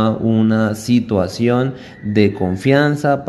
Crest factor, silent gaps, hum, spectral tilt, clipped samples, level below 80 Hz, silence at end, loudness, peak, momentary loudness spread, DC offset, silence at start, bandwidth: 16 dB; none; none; -7 dB/octave; under 0.1%; -42 dBFS; 0 s; -16 LUFS; 0 dBFS; 5 LU; under 0.1%; 0 s; 12.5 kHz